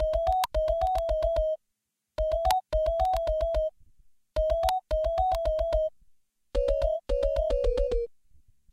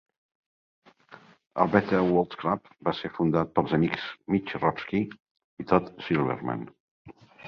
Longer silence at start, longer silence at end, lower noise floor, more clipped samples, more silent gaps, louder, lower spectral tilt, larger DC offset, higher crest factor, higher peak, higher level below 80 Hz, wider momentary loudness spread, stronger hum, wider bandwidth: second, 0 s vs 1.1 s; first, 0.65 s vs 0 s; first, -82 dBFS vs -53 dBFS; neither; second, none vs 5.20-5.25 s, 5.31-5.35 s, 5.44-5.57 s, 6.80-7.05 s; about the same, -28 LUFS vs -27 LUFS; second, -5 dB/octave vs -8.5 dB/octave; neither; about the same, 20 dB vs 24 dB; second, -8 dBFS vs -4 dBFS; first, -34 dBFS vs -58 dBFS; second, 7 LU vs 10 LU; neither; first, 16 kHz vs 6.6 kHz